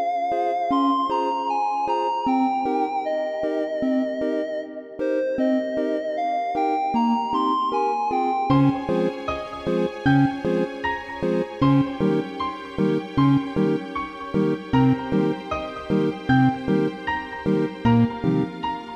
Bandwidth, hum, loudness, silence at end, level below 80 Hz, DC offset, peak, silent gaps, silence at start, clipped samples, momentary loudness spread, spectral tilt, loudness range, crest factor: 8 kHz; none; -23 LUFS; 0 s; -50 dBFS; under 0.1%; -6 dBFS; none; 0 s; under 0.1%; 8 LU; -8 dB/octave; 2 LU; 16 dB